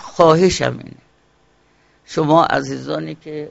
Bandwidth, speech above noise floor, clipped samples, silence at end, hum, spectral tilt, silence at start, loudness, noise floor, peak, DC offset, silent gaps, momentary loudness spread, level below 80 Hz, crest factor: 8 kHz; 41 dB; under 0.1%; 0 s; 60 Hz at -55 dBFS; -4.5 dB/octave; 0 s; -16 LUFS; -57 dBFS; 0 dBFS; under 0.1%; none; 16 LU; -46 dBFS; 18 dB